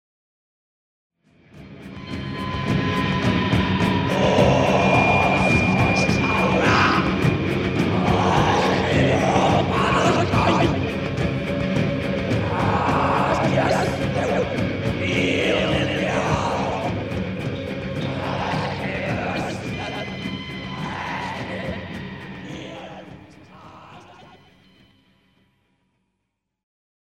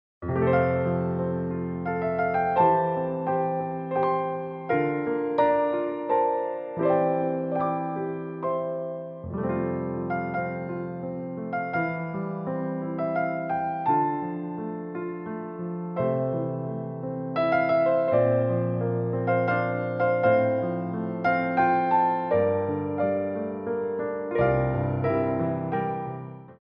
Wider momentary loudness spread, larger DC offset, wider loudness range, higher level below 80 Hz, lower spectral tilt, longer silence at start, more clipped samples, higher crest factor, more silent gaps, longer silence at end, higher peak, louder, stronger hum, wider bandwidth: about the same, 13 LU vs 11 LU; neither; first, 13 LU vs 6 LU; first, -40 dBFS vs -56 dBFS; second, -6 dB/octave vs -11 dB/octave; first, 1.55 s vs 0.2 s; neither; about the same, 18 dB vs 16 dB; neither; first, 3.05 s vs 0.05 s; first, -4 dBFS vs -10 dBFS; first, -21 LUFS vs -26 LUFS; neither; first, 13.5 kHz vs 5.4 kHz